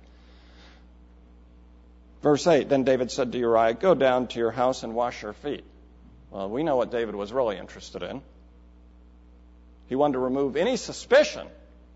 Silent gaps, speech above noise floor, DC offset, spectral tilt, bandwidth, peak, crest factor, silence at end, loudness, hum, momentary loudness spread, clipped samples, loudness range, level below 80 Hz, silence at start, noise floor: none; 27 dB; under 0.1%; -5 dB/octave; 8 kHz; -6 dBFS; 20 dB; 0.4 s; -25 LUFS; 60 Hz at -50 dBFS; 16 LU; under 0.1%; 8 LU; -52 dBFS; 2.2 s; -52 dBFS